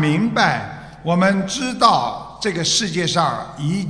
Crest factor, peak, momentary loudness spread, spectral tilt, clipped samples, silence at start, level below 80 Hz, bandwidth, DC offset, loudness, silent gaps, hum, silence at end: 18 dB; 0 dBFS; 10 LU; -4 dB/octave; under 0.1%; 0 s; -50 dBFS; 11 kHz; under 0.1%; -18 LUFS; none; none; 0 s